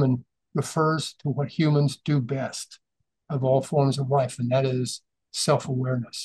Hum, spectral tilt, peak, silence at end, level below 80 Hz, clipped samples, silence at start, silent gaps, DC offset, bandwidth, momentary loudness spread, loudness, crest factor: none; -6 dB/octave; -8 dBFS; 0 s; -66 dBFS; under 0.1%; 0 s; none; under 0.1%; 12.5 kHz; 10 LU; -25 LUFS; 18 dB